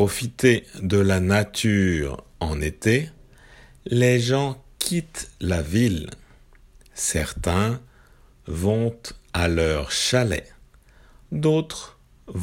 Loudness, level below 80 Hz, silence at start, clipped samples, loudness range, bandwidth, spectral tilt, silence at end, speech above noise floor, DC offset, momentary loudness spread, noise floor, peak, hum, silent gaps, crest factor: -23 LUFS; -42 dBFS; 0 s; under 0.1%; 4 LU; 16.5 kHz; -5 dB/octave; 0 s; 30 dB; under 0.1%; 14 LU; -52 dBFS; -2 dBFS; none; none; 22 dB